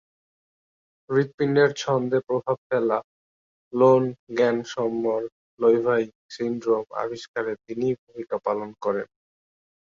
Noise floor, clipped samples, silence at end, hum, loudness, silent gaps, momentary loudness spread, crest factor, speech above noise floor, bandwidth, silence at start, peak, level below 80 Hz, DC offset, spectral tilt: under -90 dBFS; under 0.1%; 0.95 s; none; -24 LUFS; 1.34-1.38 s, 2.58-2.70 s, 3.04-3.71 s, 4.19-4.27 s, 5.32-5.57 s, 6.15-6.29 s, 7.28-7.34 s, 7.98-8.07 s; 10 LU; 20 dB; over 66 dB; 7.4 kHz; 1.1 s; -6 dBFS; -68 dBFS; under 0.1%; -6.5 dB/octave